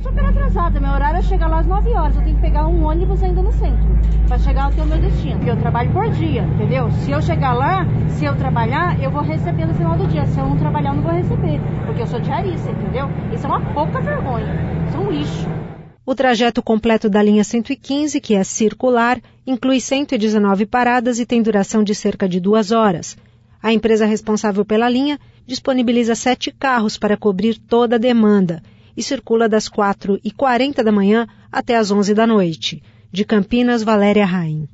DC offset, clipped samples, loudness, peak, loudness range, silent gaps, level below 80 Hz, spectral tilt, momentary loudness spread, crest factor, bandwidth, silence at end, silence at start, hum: under 0.1%; under 0.1%; -17 LUFS; -4 dBFS; 3 LU; none; -22 dBFS; -6.5 dB/octave; 7 LU; 12 dB; 8 kHz; 0.05 s; 0 s; none